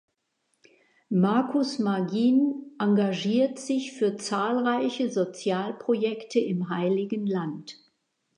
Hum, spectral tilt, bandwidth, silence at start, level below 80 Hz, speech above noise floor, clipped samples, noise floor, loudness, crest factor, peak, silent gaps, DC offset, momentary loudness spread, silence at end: none; -6 dB/octave; 10.5 kHz; 1.1 s; -80 dBFS; 50 dB; under 0.1%; -76 dBFS; -26 LUFS; 16 dB; -10 dBFS; none; under 0.1%; 6 LU; 0.65 s